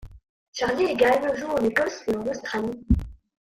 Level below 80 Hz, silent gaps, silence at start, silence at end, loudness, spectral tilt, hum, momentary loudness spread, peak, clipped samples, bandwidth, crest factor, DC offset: -38 dBFS; 0.29-0.53 s; 0 s; 0.25 s; -24 LUFS; -5.5 dB/octave; none; 9 LU; -8 dBFS; under 0.1%; 16 kHz; 18 dB; under 0.1%